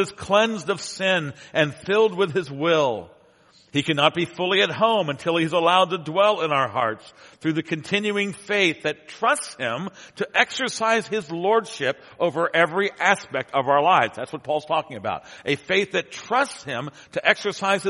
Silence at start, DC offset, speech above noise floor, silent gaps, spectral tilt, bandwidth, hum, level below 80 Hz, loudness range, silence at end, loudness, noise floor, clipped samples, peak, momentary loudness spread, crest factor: 0 s; under 0.1%; 33 dB; none; -4 dB/octave; 11.5 kHz; none; -66 dBFS; 3 LU; 0 s; -22 LUFS; -56 dBFS; under 0.1%; 0 dBFS; 9 LU; 22 dB